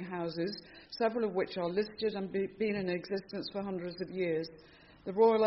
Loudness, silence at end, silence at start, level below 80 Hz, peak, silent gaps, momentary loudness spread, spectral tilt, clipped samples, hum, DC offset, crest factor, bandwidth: -35 LUFS; 0 s; 0 s; -68 dBFS; -14 dBFS; none; 8 LU; -4.5 dB/octave; under 0.1%; none; under 0.1%; 20 dB; 5.8 kHz